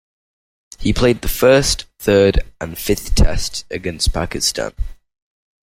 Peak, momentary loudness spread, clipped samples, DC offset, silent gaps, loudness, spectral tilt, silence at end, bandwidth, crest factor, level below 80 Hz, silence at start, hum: -2 dBFS; 13 LU; under 0.1%; under 0.1%; none; -17 LUFS; -4 dB/octave; 0.75 s; 16.5 kHz; 16 dB; -24 dBFS; 0.8 s; none